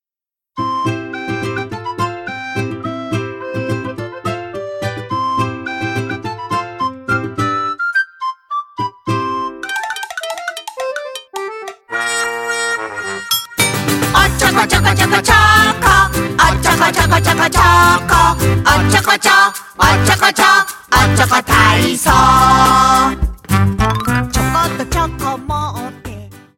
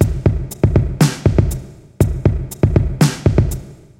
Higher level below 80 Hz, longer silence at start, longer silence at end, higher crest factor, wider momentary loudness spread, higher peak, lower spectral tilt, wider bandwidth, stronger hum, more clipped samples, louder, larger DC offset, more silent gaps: about the same, -28 dBFS vs -24 dBFS; first, 0.55 s vs 0 s; about the same, 0.2 s vs 0.25 s; about the same, 14 dB vs 16 dB; first, 15 LU vs 6 LU; about the same, 0 dBFS vs 0 dBFS; second, -3.5 dB/octave vs -7 dB/octave; about the same, 17 kHz vs 16.5 kHz; neither; neither; first, -13 LUFS vs -17 LUFS; second, under 0.1% vs 0.1%; neither